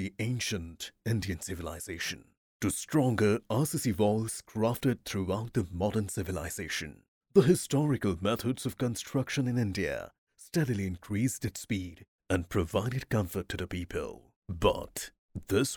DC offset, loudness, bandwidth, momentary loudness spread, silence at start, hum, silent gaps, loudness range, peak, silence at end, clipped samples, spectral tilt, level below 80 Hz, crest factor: under 0.1%; -32 LUFS; over 20 kHz; 11 LU; 0 s; none; 2.37-2.60 s, 7.08-7.21 s, 10.18-10.27 s, 12.08-12.19 s, 14.36-14.42 s, 15.18-15.29 s; 4 LU; -8 dBFS; 0 s; under 0.1%; -5.5 dB/octave; -54 dBFS; 22 dB